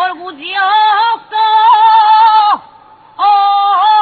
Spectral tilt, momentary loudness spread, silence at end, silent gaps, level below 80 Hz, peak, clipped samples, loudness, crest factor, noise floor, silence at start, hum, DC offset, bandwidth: -2.5 dB/octave; 10 LU; 0 s; none; -64 dBFS; 0 dBFS; under 0.1%; -9 LUFS; 10 dB; -40 dBFS; 0 s; none; under 0.1%; 4.8 kHz